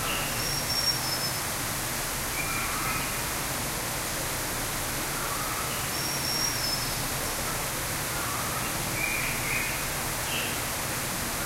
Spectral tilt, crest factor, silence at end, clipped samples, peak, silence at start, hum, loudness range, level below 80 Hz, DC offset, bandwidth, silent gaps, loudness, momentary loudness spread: -2 dB/octave; 16 dB; 0 s; under 0.1%; -14 dBFS; 0 s; none; 1 LU; -44 dBFS; under 0.1%; 16 kHz; none; -28 LUFS; 3 LU